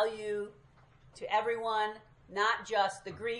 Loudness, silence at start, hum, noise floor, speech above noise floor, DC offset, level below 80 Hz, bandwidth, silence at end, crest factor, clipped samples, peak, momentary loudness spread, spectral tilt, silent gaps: -33 LUFS; 0 s; none; -61 dBFS; 27 dB; under 0.1%; -68 dBFS; 11.5 kHz; 0 s; 18 dB; under 0.1%; -16 dBFS; 13 LU; -3 dB/octave; none